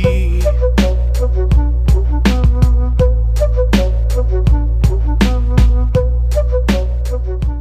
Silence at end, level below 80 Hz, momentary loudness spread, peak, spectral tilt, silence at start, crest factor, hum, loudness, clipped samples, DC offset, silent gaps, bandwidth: 0 s; -12 dBFS; 3 LU; 0 dBFS; -7.5 dB/octave; 0 s; 12 dB; none; -15 LUFS; under 0.1%; under 0.1%; none; 9 kHz